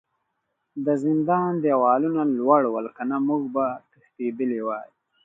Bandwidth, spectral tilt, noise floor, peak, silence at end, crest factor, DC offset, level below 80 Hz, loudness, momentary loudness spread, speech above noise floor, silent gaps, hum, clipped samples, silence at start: 7.6 kHz; -10 dB/octave; -77 dBFS; -4 dBFS; 0.4 s; 20 dB; under 0.1%; -76 dBFS; -23 LUFS; 11 LU; 54 dB; none; none; under 0.1%; 0.75 s